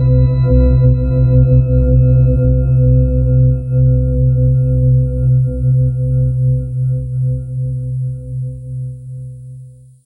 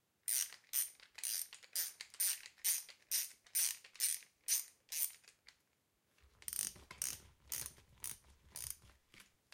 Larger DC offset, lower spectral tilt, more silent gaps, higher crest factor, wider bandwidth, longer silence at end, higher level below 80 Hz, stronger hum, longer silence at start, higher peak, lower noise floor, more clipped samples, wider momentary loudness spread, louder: neither; first, -12.5 dB/octave vs 2 dB/octave; neither; second, 12 dB vs 24 dB; second, 1.5 kHz vs 17 kHz; about the same, 0.35 s vs 0.3 s; first, -20 dBFS vs -74 dBFS; neither; second, 0 s vs 0.3 s; first, -2 dBFS vs -20 dBFS; second, -36 dBFS vs -80 dBFS; neither; first, 14 LU vs 11 LU; first, -13 LUFS vs -40 LUFS